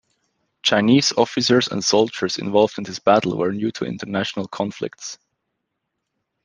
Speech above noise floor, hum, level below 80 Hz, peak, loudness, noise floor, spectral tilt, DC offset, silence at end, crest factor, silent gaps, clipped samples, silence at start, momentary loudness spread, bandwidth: 58 dB; none; -62 dBFS; -2 dBFS; -20 LUFS; -78 dBFS; -4 dB/octave; under 0.1%; 1.3 s; 18 dB; none; under 0.1%; 0.65 s; 13 LU; 10.5 kHz